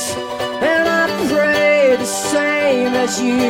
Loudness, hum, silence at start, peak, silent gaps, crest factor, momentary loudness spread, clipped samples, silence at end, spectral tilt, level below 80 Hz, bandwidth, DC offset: -15 LUFS; none; 0 s; -4 dBFS; none; 12 dB; 6 LU; under 0.1%; 0 s; -3 dB/octave; -52 dBFS; 16.5 kHz; under 0.1%